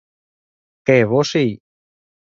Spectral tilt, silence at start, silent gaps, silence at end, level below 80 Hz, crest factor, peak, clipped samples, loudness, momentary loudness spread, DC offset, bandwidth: -6 dB/octave; 0.85 s; none; 0.8 s; -60 dBFS; 20 dB; 0 dBFS; under 0.1%; -17 LUFS; 10 LU; under 0.1%; 7.6 kHz